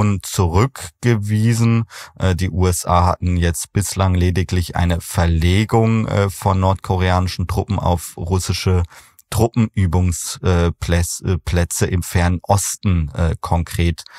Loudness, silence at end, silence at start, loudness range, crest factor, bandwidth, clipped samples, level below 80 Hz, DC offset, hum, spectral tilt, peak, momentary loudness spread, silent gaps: -18 LUFS; 0 s; 0 s; 2 LU; 16 dB; 15.5 kHz; under 0.1%; -30 dBFS; under 0.1%; none; -5.5 dB/octave; 0 dBFS; 5 LU; none